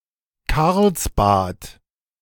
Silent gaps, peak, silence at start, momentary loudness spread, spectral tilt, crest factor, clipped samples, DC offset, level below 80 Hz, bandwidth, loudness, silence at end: none; -4 dBFS; 0.5 s; 14 LU; -5.5 dB/octave; 16 dB; under 0.1%; under 0.1%; -32 dBFS; 19.5 kHz; -19 LUFS; 0.5 s